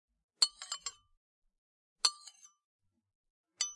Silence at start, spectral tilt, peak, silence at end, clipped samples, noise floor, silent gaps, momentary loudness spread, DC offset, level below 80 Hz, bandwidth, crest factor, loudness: 0.4 s; 5 dB/octave; -12 dBFS; 0 s; under 0.1%; -58 dBFS; 1.17-1.42 s, 1.58-1.96 s, 2.64-2.79 s, 3.15-3.24 s, 3.30-3.44 s; 19 LU; under 0.1%; -82 dBFS; 11.5 kHz; 30 dB; -33 LUFS